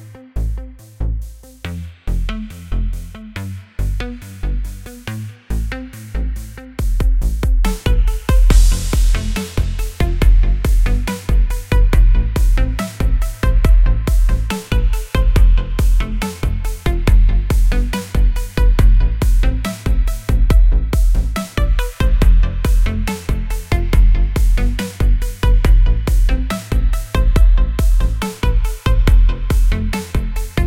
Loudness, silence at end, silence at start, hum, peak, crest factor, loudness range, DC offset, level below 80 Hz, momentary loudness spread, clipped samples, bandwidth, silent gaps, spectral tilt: -18 LUFS; 0 s; 0 s; none; 0 dBFS; 14 dB; 9 LU; 0.2%; -14 dBFS; 12 LU; under 0.1%; 15 kHz; none; -6 dB/octave